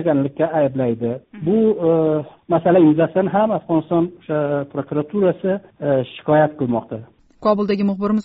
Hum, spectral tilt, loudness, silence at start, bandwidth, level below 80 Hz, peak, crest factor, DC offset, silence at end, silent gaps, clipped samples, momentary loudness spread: none; -7.5 dB/octave; -19 LUFS; 0 s; 5.2 kHz; -56 dBFS; -4 dBFS; 16 dB; under 0.1%; 0 s; none; under 0.1%; 8 LU